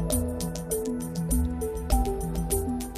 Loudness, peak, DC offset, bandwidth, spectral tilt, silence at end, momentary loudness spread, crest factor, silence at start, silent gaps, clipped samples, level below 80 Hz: -29 LUFS; -10 dBFS; under 0.1%; 14.5 kHz; -5.5 dB/octave; 0 s; 4 LU; 18 dB; 0 s; none; under 0.1%; -32 dBFS